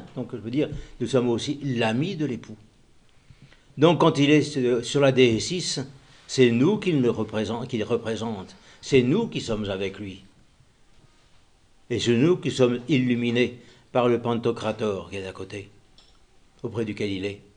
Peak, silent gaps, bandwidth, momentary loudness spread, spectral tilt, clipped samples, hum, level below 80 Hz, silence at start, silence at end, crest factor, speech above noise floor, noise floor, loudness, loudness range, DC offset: -4 dBFS; none; 10 kHz; 16 LU; -5.5 dB/octave; under 0.1%; none; -54 dBFS; 0 s; 0.15 s; 20 dB; 34 dB; -57 dBFS; -24 LUFS; 7 LU; under 0.1%